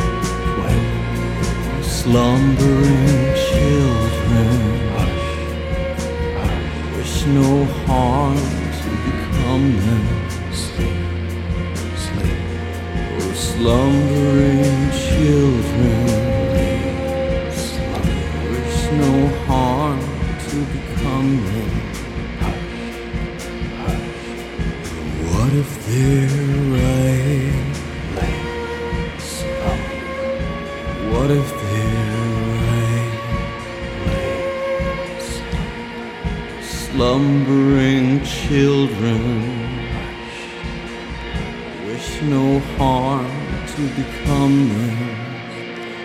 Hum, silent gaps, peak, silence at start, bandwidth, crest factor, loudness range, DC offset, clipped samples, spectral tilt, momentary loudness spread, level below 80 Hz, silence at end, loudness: none; none; -2 dBFS; 0 s; 15.5 kHz; 16 dB; 7 LU; under 0.1%; under 0.1%; -6.5 dB/octave; 12 LU; -28 dBFS; 0 s; -19 LUFS